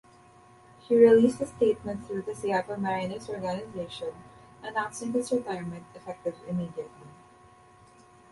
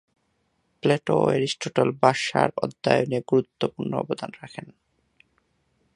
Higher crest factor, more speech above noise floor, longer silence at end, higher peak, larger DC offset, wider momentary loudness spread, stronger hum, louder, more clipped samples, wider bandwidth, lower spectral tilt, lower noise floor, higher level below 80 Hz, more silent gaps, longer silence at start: about the same, 22 dB vs 24 dB; second, 28 dB vs 47 dB; about the same, 1.2 s vs 1.25 s; second, -6 dBFS vs -2 dBFS; neither; first, 19 LU vs 12 LU; neither; second, -28 LUFS vs -24 LUFS; neither; about the same, 11.5 kHz vs 11 kHz; about the same, -6 dB/octave vs -5.5 dB/octave; second, -56 dBFS vs -71 dBFS; about the same, -62 dBFS vs -64 dBFS; neither; about the same, 0.9 s vs 0.85 s